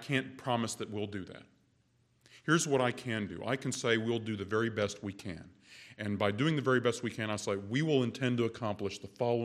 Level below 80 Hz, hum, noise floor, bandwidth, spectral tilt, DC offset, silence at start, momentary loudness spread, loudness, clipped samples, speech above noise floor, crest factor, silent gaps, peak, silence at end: -70 dBFS; none; -71 dBFS; 14.5 kHz; -5 dB/octave; under 0.1%; 0 s; 14 LU; -33 LUFS; under 0.1%; 38 dB; 20 dB; none; -14 dBFS; 0 s